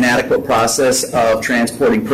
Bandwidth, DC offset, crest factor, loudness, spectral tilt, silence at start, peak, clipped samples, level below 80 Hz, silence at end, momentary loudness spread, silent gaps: 16 kHz; under 0.1%; 6 dB; -14 LUFS; -3.5 dB/octave; 0 s; -8 dBFS; under 0.1%; -44 dBFS; 0 s; 2 LU; none